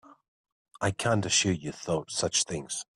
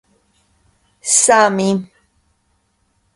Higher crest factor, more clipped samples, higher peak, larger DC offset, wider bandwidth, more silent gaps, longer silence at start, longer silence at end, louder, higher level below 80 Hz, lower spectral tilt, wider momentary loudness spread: about the same, 20 dB vs 18 dB; neither; second, -10 dBFS vs 0 dBFS; neither; about the same, 12.5 kHz vs 11.5 kHz; first, 0.28-0.44 s, 0.52-0.65 s vs none; second, 0.1 s vs 1.05 s; second, 0.1 s vs 1.3 s; second, -28 LUFS vs -14 LUFS; about the same, -60 dBFS vs -60 dBFS; about the same, -3 dB/octave vs -3 dB/octave; second, 8 LU vs 12 LU